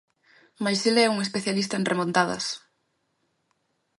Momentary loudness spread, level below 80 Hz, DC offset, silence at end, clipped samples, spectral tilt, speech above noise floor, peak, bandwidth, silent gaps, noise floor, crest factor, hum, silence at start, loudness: 10 LU; -70 dBFS; under 0.1%; 1.4 s; under 0.1%; -4 dB/octave; 49 dB; -6 dBFS; 11.5 kHz; none; -74 dBFS; 22 dB; none; 0.6 s; -24 LUFS